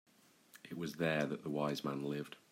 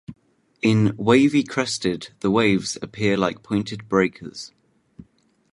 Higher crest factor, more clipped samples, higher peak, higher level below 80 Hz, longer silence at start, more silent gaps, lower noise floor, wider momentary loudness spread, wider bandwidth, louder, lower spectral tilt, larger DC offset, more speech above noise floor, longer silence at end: about the same, 18 dB vs 20 dB; neither; second, -22 dBFS vs -4 dBFS; second, -78 dBFS vs -56 dBFS; first, 0.55 s vs 0.1 s; neither; first, -64 dBFS vs -57 dBFS; about the same, 10 LU vs 12 LU; first, 16 kHz vs 11.5 kHz; second, -39 LUFS vs -21 LUFS; about the same, -6 dB/octave vs -5.5 dB/octave; neither; second, 25 dB vs 36 dB; second, 0.15 s vs 0.5 s